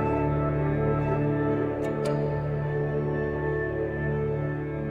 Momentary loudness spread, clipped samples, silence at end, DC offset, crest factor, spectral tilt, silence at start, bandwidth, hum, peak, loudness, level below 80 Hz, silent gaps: 3 LU; under 0.1%; 0 s; under 0.1%; 12 dB; -9 dB/octave; 0 s; 9.4 kHz; none; -14 dBFS; -27 LUFS; -42 dBFS; none